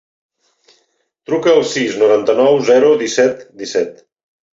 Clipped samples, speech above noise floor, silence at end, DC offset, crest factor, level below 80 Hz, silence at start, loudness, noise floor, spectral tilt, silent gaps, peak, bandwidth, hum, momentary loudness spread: under 0.1%; 50 dB; 0.6 s; under 0.1%; 14 dB; -62 dBFS; 1.3 s; -14 LUFS; -63 dBFS; -4 dB/octave; none; -2 dBFS; 7.8 kHz; none; 10 LU